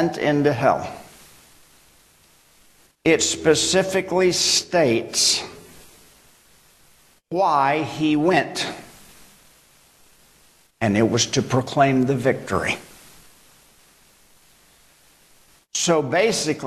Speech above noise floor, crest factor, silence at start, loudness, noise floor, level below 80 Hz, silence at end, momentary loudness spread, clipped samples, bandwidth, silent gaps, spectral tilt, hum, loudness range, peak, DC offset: 36 dB; 20 dB; 0 s; -20 LUFS; -56 dBFS; -56 dBFS; 0 s; 9 LU; under 0.1%; 13 kHz; none; -3.5 dB/octave; none; 7 LU; -4 dBFS; under 0.1%